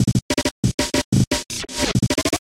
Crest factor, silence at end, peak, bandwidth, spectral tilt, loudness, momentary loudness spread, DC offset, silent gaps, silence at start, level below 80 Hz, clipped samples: 14 dB; 0 s; -6 dBFS; 16.5 kHz; -4.5 dB/octave; -21 LUFS; 3 LU; under 0.1%; 0.22-0.29 s, 0.51-0.63 s, 0.74-0.78 s, 1.04-1.12 s, 1.27-1.31 s; 0 s; -36 dBFS; under 0.1%